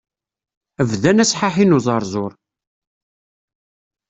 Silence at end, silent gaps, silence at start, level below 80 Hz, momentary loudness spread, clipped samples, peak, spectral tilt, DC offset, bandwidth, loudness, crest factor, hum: 1.8 s; none; 0.8 s; -54 dBFS; 11 LU; under 0.1%; -2 dBFS; -5 dB/octave; under 0.1%; 8.2 kHz; -16 LUFS; 18 dB; none